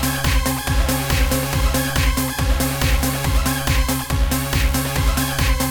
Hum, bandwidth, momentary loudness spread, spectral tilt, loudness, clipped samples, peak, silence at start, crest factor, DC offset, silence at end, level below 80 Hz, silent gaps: none; 19.5 kHz; 1 LU; -4 dB/octave; -19 LUFS; under 0.1%; -4 dBFS; 0 s; 14 dB; under 0.1%; 0 s; -22 dBFS; none